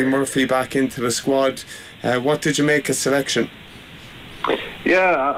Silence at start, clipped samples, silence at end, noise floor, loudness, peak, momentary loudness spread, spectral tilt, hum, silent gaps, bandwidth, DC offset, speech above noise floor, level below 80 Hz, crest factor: 0 s; under 0.1%; 0 s; -40 dBFS; -20 LUFS; -8 dBFS; 21 LU; -4 dB/octave; none; none; 16 kHz; under 0.1%; 20 dB; -52 dBFS; 12 dB